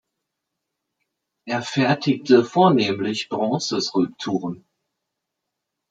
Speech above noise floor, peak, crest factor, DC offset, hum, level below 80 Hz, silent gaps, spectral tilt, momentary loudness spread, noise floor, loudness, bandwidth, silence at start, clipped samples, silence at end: 61 dB; -4 dBFS; 20 dB; under 0.1%; none; -68 dBFS; none; -5.5 dB/octave; 11 LU; -81 dBFS; -21 LUFS; 9 kHz; 1.45 s; under 0.1%; 1.35 s